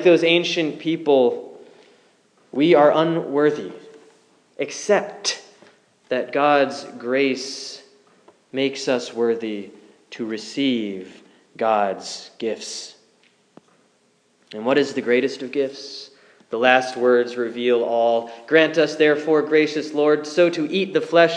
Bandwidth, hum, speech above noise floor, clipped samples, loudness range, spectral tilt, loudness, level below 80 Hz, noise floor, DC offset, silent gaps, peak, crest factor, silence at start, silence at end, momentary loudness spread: 10 kHz; none; 42 dB; under 0.1%; 8 LU; -4.5 dB/octave; -20 LUFS; -86 dBFS; -62 dBFS; under 0.1%; none; 0 dBFS; 20 dB; 0 s; 0 s; 16 LU